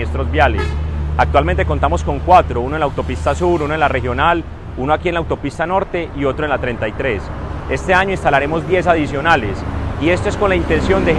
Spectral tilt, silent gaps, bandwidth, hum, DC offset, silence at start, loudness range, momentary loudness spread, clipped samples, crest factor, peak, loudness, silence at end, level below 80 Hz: -6.5 dB/octave; none; 10 kHz; none; under 0.1%; 0 s; 3 LU; 8 LU; under 0.1%; 16 dB; 0 dBFS; -16 LUFS; 0 s; -24 dBFS